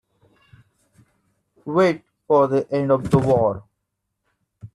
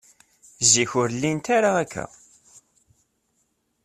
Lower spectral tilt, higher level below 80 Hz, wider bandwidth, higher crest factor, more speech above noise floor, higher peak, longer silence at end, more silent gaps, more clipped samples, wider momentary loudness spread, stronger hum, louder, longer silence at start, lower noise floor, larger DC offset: first, -8 dB/octave vs -2.5 dB/octave; first, -52 dBFS vs -62 dBFS; second, 12 kHz vs 14.5 kHz; about the same, 20 dB vs 22 dB; first, 59 dB vs 49 dB; about the same, -2 dBFS vs -4 dBFS; second, 0.05 s vs 1.8 s; neither; neither; second, 13 LU vs 16 LU; neither; about the same, -20 LUFS vs -21 LUFS; first, 1.65 s vs 0.6 s; first, -78 dBFS vs -71 dBFS; neither